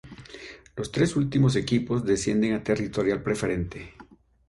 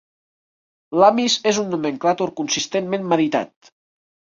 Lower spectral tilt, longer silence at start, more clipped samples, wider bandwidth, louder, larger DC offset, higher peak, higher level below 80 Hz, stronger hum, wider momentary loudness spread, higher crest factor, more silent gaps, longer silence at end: first, -6 dB/octave vs -3.5 dB/octave; second, 0.05 s vs 0.9 s; neither; first, 11.5 kHz vs 7.8 kHz; second, -26 LUFS vs -19 LUFS; neither; second, -10 dBFS vs -2 dBFS; first, -48 dBFS vs -64 dBFS; neither; first, 19 LU vs 9 LU; about the same, 16 dB vs 20 dB; neither; second, 0.45 s vs 0.85 s